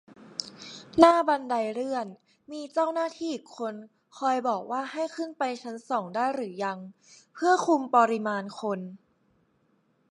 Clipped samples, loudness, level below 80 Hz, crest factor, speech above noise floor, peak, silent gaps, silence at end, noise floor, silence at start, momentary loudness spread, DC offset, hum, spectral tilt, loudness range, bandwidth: under 0.1%; -27 LUFS; -68 dBFS; 26 dB; 42 dB; -2 dBFS; none; 1.15 s; -69 dBFS; 0.2 s; 17 LU; under 0.1%; none; -4.5 dB/octave; 5 LU; 11 kHz